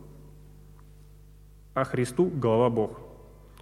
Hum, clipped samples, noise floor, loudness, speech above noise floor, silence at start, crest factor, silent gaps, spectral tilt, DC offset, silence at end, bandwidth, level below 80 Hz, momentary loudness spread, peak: 50 Hz at -50 dBFS; under 0.1%; -51 dBFS; -27 LUFS; 26 dB; 0 s; 18 dB; none; -7 dB/octave; under 0.1%; 0.4 s; 15 kHz; -52 dBFS; 23 LU; -10 dBFS